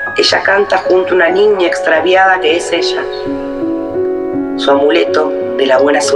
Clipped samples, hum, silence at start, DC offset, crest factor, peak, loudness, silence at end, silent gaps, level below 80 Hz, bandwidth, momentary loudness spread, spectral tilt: under 0.1%; none; 0 s; under 0.1%; 12 dB; 0 dBFS; -11 LUFS; 0 s; none; -46 dBFS; 11.5 kHz; 9 LU; -3 dB/octave